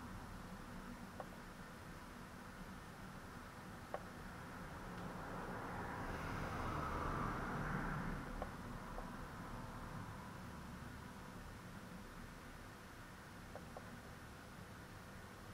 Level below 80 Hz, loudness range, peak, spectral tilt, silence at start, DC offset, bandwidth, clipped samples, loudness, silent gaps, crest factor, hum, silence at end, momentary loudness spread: -58 dBFS; 10 LU; -28 dBFS; -5.5 dB/octave; 0 s; under 0.1%; 16 kHz; under 0.1%; -50 LUFS; none; 20 dB; none; 0 s; 12 LU